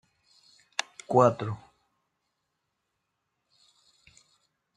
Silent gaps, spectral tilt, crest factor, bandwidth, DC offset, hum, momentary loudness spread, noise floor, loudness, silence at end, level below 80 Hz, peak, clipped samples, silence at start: none; -5.5 dB/octave; 26 dB; 11 kHz; under 0.1%; none; 14 LU; -81 dBFS; -27 LUFS; 3.2 s; -72 dBFS; -8 dBFS; under 0.1%; 1.1 s